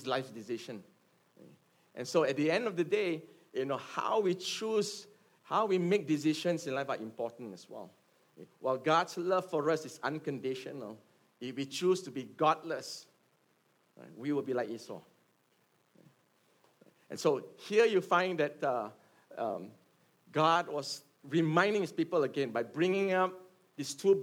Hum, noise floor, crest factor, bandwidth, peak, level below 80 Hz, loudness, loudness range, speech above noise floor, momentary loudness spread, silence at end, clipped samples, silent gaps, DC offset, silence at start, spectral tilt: none; -72 dBFS; 22 dB; 16.5 kHz; -12 dBFS; -88 dBFS; -33 LUFS; 7 LU; 40 dB; 17 LU; 0 s; under 0.1%; none; under 0.1%; 0 s; -5 dB/octave